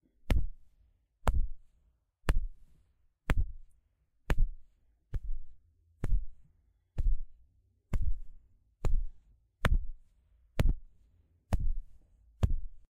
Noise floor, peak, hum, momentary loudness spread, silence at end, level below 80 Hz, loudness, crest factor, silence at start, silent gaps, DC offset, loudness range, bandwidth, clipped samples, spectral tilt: -72 dBFS; -8 dBFS; none; 13 LU; 0.1 s; -34 dBFS; -38 LUFS; 24 dB; 0.25 s; none; under 0.1%; 4 LU; 10.5 kHz; under 0.1%; -6.5 dB/octave